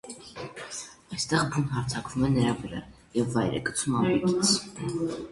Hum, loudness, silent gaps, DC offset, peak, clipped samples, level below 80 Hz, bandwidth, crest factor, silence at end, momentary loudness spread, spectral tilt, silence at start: none; -27 LUFS; none; under 0.1%; -10 dBFS; under 0.1%; -52 dBFS; 11.5 kHz; 18 dB; 0 s; 15 LU; -4.5 dB/octave; 0.05 s